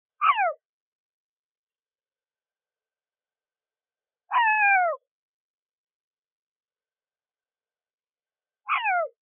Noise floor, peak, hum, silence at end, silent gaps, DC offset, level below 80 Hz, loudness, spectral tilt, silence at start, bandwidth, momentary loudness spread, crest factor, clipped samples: under -90 dBFS; -8 dBFS; none; 0.15 s; 0.65-1.67 s, 5.07-5.66 s, 5.73-5.87 s, 5.95-6.11 s, 6.18-6.22 s, 6.32-6.60 s, 7.94-7.98 s; under 0.1%; under -90 dBFS; -23 LUFS; 19 dB/octave; 0.2 s; 3.7 kHz; 9 LU; 22 dB; under 0.1%